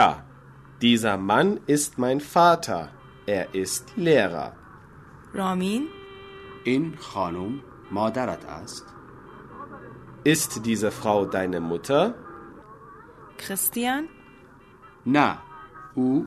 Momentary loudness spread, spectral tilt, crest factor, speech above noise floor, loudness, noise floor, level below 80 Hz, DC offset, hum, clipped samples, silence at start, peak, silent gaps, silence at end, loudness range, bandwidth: 22 LU; -4.5 dB/octave; 22 dB; 27 dB; -24 LUFS; -50 dBFS; -58 dBFS; under 0.1%; none; under 0.1%; 0 s; -4 dBFS; none; 0 s; 7 LU; 13.5 kHz